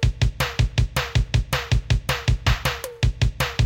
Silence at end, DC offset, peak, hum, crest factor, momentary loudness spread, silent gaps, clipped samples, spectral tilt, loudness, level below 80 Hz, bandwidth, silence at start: 0 s; under 0.1%; -6 dBFS; none; 14 dB; 2 LU; none; under 0.1%; -4.5 dB/octave; -23 LUFS; -26 dBFS; 17 kHz; 0 s